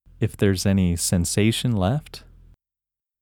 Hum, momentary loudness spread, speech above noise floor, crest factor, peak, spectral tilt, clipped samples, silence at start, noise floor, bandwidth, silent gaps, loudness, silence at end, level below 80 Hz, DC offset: none; 9 LU; 68 dB; 18 dB; -6 dBFS; -5 dB/octave; under 0.1%; 0.2 s; -89 dBFS; 18 kHz; none; -22 LUFS; 1.05 s; -44 dBFS; under 0.1%